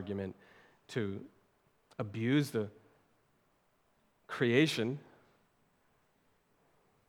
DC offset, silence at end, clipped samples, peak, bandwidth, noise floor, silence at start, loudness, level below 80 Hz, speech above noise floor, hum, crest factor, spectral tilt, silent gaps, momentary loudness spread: under 0.1%; 2.1 s; under 0.1%; -14 dBFS; 18 kHz; -74 dBFS; 0 s; -34 LUFS; -82 dBFS; 40 dB; none; 24 dB; -6 dB/octave; none; 17 LU